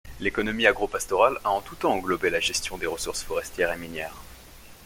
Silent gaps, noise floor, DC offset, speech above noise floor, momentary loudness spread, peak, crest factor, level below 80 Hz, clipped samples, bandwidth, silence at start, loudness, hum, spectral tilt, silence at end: none; -47 dBFS; under 0.1%; 21 dB; 10 LU; -2 dBFS; 24 dB; -48 dBFS; under 0.1%; 17 kHz; 0.05 s; -26 LUFS; none; -2.5 dB/octave; 0 s